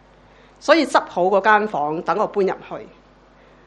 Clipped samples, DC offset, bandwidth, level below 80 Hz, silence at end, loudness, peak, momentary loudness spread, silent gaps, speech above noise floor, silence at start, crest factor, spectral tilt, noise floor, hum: under 0.1%; under 0.1%; 10 kHz; -58 dBFS; 0.8 s; -18 LUFS; 0 dBFS; 14 LU; none; 32 dB; 0.65 s; 20 dB; -4.5 dB/octave; -50 dBFS; 50 Hz at -55 dBFS